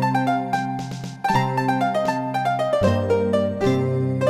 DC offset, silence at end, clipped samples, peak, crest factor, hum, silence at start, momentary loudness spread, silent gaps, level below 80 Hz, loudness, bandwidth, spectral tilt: under 0.1%; 0 s; under 0.1%; -6 dBFS; 16 dB; none; 0 s; 5 LU; none; -52 dBFS; -22 LUFS; 14.5 kHz; -7 dB/octave